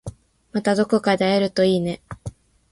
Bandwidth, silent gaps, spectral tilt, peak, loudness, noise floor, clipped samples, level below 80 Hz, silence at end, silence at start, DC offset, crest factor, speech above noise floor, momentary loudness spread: 11.5 kHz; none; -6 dB/octave; -6 dBFS; -20 LUFS; -39 dBFS; under 0.1%; -50 dBFS; 0.4 s; 0.05 s; under 0.1%; 16 dB; 19 dB; 18 LU